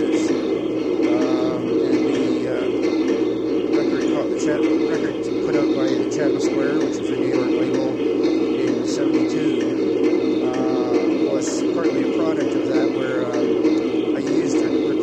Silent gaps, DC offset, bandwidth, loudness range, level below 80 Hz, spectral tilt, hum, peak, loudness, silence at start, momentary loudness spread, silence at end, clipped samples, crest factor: none; under 0.1%; 8.8 kHz; 0 LU; -56 dBFS; -5.5 dB/octave; none; -6 dBFS; -20 LUFS; 0 s; 2 LU; 0 s; under 0.1%; 12 dB